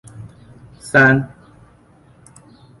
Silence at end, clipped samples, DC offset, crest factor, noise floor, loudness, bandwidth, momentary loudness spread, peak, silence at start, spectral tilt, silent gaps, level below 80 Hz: 1.55 s; under 0.1%; under 0.1%; 20 dB; -50 dBFS; -14 LUFS; 11.5 kHz; 27 LU; -2 dBFS; 0.2 s; -6.5 dB/octave; none; -52 dBFS